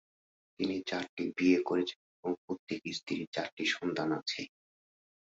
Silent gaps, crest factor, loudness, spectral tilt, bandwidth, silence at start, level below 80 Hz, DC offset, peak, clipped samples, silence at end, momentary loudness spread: 1.09-1.17 s, 1.96-2.23 s, 2.38-2.48 s, 2.59-2.67 s, 3.27-3.32 s, 3.52-3.57 s; 20 dB; -34 LUFS; -4.5 dB/octave; 7.8 kHz; 0.6 s; -74 dBFS; under 0.1%; -16 dBFS; under 0.1%; 0.75 s; 11 LU